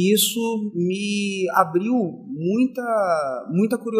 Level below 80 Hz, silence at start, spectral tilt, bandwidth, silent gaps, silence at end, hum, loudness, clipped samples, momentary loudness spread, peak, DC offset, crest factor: -72 dBFS; 0 s; -4.5 dB/octave; 16 kHz; none; 0 s; none; -22 LUFS; under 0.1%; 5 LU; 0 dBFS; under 0.1%; 20 dB